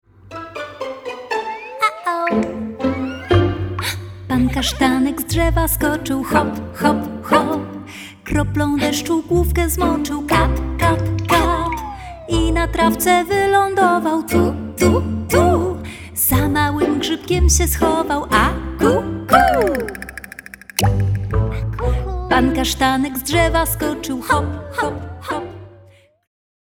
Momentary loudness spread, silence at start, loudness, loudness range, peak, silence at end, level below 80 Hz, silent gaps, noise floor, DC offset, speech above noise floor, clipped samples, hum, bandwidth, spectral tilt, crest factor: 13 LU; 0.25 s; -18 LUFS; 4 LU; 0 dBFS; 1.05 s; -28 dBFS; none; -48 dBFS; under 0.1%; 31 dB; under 0.1%; none; over 20 kHz; -5 dB/octave; 18 dB